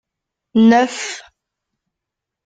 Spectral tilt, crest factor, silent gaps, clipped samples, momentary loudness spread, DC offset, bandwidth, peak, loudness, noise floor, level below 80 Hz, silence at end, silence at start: -4.5 dB/octave; 18 dB; none; under 0.1%; 16 LU; under 0.1%; 9.2 kHz; -2 dBFS; -15 LUFS; -83 dBFS; -60 dBFS; 1.25 s; 0.55 s